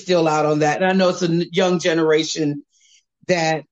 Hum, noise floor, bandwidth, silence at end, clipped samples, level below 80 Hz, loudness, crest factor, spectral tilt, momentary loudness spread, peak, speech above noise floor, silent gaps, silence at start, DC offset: none; -57 dBFS; 8.4 kHz; 0.1 s; under 0.1%; -64 dBFS; -18 LUFS; 14 dB; -5 dB/octave; 6 LU; -6 dBFS; 39 dB; none; 0 s; under 0.1%